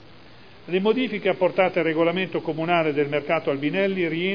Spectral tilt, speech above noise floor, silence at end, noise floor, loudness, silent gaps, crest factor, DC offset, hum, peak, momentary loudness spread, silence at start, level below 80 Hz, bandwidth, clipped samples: -8 dB/octave; 26 dB; 0 s; -48 dBFS; -23 LUFS; none; 16 dB; 0.4%; none; -6 dBFS; 4 LU; 0.65 s; -68 dBFS; 5.2 kHz; under 0.1%